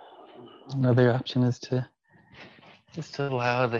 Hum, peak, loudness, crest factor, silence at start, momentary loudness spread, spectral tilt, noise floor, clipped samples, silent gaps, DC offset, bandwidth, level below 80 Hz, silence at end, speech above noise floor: none; -8 dBFS; -26 LUFS; 18 dB; 0.1 s; 21 LU; -7.5 dB/octave; -54 dBFS; under 0.1%; none; under 0.1%; 7.4 kHz; -68 dBFS; 0 s; 29 dB